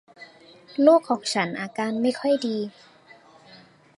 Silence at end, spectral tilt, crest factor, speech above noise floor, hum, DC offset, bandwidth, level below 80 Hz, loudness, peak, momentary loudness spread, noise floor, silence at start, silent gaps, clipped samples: 1.25 s; -4.5 dB/octave; 20 dB; 30 dB; none; under 0.1%; 11.5 kHz; -76 dBFS; -23 LUFS; -4 dBFS; 12 LU; -52 dBFS; 0.2 s; none; under 0.1%